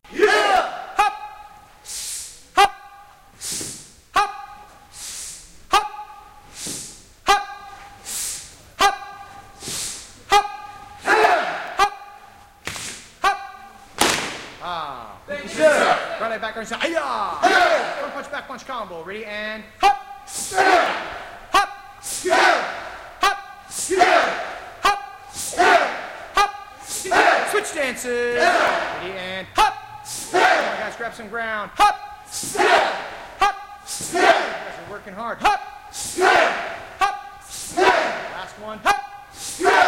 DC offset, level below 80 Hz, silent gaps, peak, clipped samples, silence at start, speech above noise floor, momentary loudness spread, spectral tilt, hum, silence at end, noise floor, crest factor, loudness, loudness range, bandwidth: under 0.1%; -50 dBFS; none; 0 dBFS; under 0.1%; 0.1 s; 25 dB; 18 LU; -1.5 dB/octave; none; 0 s; -46 dBFS; 22 dB; -21 LUFS; 5 LU; 16.5 kHz